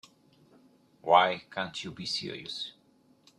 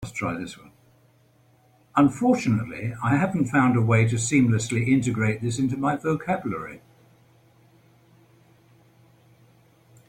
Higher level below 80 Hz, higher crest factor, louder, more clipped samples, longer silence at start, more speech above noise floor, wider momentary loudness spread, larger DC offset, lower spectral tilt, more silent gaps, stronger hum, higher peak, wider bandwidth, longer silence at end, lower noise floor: second, -74 dBFS vs -56 dBFS; first, 26 dB vs 18 dB; second, -29 LUFS vs -23 LUFS; neither; first, 1.05 s vs 0 s; about the same, 35 dB vs 37 dB; first, 15 LU vs 12 LU; neither; second, -3.5 dB/octave vs -6.5 dB/octave; neither; neither; about the same, -6 dBFS vs -8 dBFS; about the same, 12 kHz vs 11.5 kHz; second, 0.7 s vs 3.3 s; first, -64 dBFS vs -59 dBFS